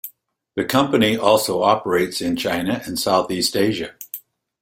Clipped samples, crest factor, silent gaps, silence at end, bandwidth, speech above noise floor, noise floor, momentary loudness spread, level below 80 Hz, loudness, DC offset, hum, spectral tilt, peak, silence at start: under 0.1%; 20 dB; none; 0.45 s; 16.5 kHz; 35 dB; -54 dBFS; 14 LU; -54 dBFS; -19 LUFS; under 0.1%; none; -4 dB/octave; 0 dBFS; 0.05 s